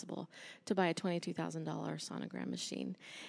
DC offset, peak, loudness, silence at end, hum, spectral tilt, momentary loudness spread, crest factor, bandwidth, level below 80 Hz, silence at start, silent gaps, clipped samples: under 0.1%; -18 dBFS; -40 LUFS; 0 s; none; -5 dB/octave; 12 LU; 22 dB; 11 kHz; -88 dBFS; 0 s; none; under 0.1%